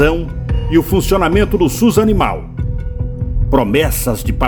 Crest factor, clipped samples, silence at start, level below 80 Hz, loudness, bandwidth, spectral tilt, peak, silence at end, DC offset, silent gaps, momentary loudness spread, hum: 14 dB; under 0.1%; 0 s; -20 dBFS; -15 LUFS; over 20 kHz; -6 dB/octave; 0 dBFS; 0 s; under 0.1%; none; 10 LU; none